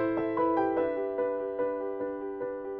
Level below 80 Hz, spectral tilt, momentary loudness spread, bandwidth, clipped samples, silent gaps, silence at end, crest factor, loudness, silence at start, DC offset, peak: -64 dBFS; -6 dB/octave; 8 LU; 4.3 kHz; under 0.1%; none; 0 s; 14 dB; -31 LUFS; 0 s; under 0.1%; -16 dBFS